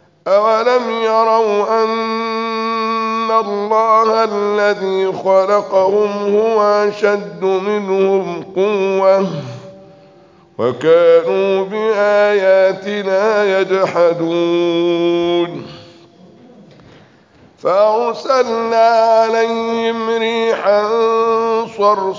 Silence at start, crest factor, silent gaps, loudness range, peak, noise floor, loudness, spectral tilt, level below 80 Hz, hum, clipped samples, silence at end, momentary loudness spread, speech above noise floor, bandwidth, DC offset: 0.25 s; 14 dB; none; 4 LU; -2 dBFS; -47 dBFS; -14 LUFS; -5.5 dB/octave; -64 dBFS; none; under 0.1%; 0 s; 6 LU; 33 dB; 7.6 kHz; under 0.1%